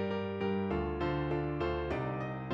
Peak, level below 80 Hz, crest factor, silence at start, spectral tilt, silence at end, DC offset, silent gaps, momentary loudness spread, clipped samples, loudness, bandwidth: -22 dBFS; -48 dBFS; 12 dB; 0 s; -8.5 dB/octave; 0 s; under 0.1%; none; 2 LU; under 0.1%; -35 LUFS; 7.4 kHz